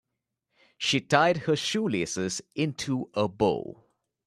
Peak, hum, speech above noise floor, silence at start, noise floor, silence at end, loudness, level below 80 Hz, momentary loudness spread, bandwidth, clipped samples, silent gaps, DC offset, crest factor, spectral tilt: -6 dBFS; none; 56 dB; 0.8 s; -83 dBFS; 0.55 s; -27 LUFS; -62 dBFS; 9 LU; 13 kHz; under 0.1%; none; under 0.1%; 24 dB; -4.5 dB/octave